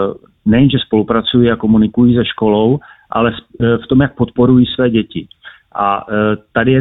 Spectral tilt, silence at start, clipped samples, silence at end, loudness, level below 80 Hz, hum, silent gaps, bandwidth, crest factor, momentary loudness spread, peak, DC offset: -11 dB/octave; 0 s; under 0.1%; 0 s; -13 LUFS; -40 dBFS; none; none; 4.1 kHz; 12 dB; 9 LU; 0 dBFS; under 0.1%